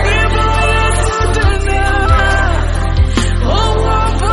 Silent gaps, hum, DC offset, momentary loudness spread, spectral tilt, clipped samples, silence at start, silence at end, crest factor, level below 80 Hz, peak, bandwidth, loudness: none; none; under 0.1%; 3 LU; -5 dB/octave; under 0.1%; 0 s; 0 s; 10 dB; -14 dBFS; 0 dBFS; 11.5 kHz; -13 LUFS